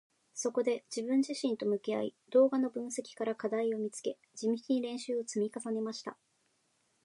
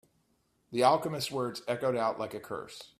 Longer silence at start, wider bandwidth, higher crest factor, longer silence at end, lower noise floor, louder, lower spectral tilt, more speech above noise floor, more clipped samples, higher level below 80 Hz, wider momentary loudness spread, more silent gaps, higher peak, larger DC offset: second, 0.35 s vs 0.7 s; second, 11.5 kHz vs 15.5 kHz; about the same, 18 dB vs 22 dB; first, 0.9 s vs 0.15 s; about the same, -75 dBFS vs -73 dBFS; second, -34 LUFS vs -31 LUFS; about the same, -4.5 dB/octave vs -4.5 dB/octave; about the same, 42 dB vs 42 dB; neither; second, -90 dBFS vs -72 dBFS; second, 10 LU vs 14 LU; neither; second, -16 dBFS vs -10 dBFS; neither